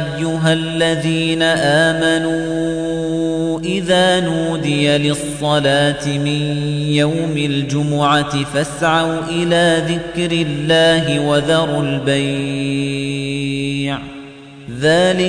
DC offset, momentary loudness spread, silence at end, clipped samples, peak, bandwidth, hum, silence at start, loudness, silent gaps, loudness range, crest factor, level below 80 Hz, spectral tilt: under 0.1%; 7 LU; 0 s; under 0.1%; -2 dBFS; 10.5 kHz; none; 0 s; -16 LUFS; none; 2 LU; 14 dB; -44 dBFS; -5 dB/octave